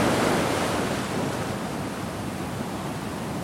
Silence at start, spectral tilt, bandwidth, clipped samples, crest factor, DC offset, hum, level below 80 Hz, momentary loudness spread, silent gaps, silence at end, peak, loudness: 0 s; -5 dB/octave; 16.5 kHz; under 0.1%; 18 dB; under 0.1%; none; -48 dBFS; 9 LU; none; 0 s; -10 dBFS; -27 LUFS